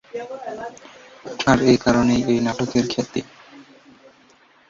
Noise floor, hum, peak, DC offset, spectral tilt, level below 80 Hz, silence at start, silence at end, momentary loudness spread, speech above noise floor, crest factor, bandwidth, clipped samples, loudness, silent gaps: -54 dBFS; none; -2 dBFS; under 0.1%; -5.5 dB/octave; -48 dBFS; 0.15 s; 1.1 s; 20 LU; 34 dB; 20 dB; 7.6 kHz; under 0.1%; -20 LUFS; none